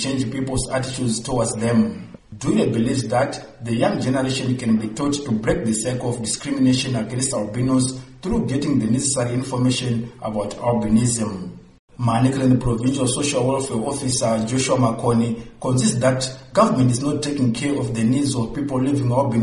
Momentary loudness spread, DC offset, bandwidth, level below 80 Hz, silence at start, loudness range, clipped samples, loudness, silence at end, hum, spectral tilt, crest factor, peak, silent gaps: 7 LU; under 0.1%; 11.5 kHz; -44 dBFS; 0 s; 2 LU; under 0.1%; -21 LUFS; 0 s; none; -5.5 dB/octave; 18 dB; -4 dBFS; 11.79-11.88 s